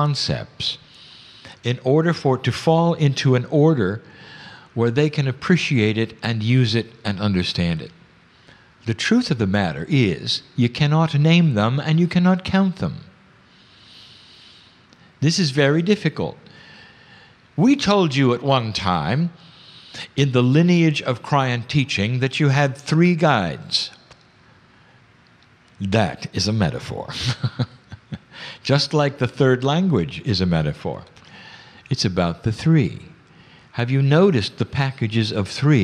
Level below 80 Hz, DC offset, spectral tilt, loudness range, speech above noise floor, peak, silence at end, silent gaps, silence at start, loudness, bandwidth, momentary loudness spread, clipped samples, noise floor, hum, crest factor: -50 dBFS; under 0.1%; -6 dB/octave; 5 LU; 34 dB; -4 dBFS; 0 s; none; 0 s; -20 LUFS; 10.5 kHz; 13 LU; under 0.1%; -53 dBFS; none; 16 dB